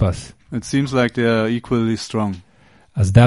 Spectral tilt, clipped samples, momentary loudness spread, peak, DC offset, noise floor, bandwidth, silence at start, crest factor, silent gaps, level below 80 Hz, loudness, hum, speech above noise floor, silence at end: -6.5 dB/octave; under 0.1%; 13 LU; 0 dBFS; 0.1%; -49 dBFS; 11.5 kHz; 0 s; 18 dB; none; -40 dBFS; -20 LUFS; none; 31 dB; 0 s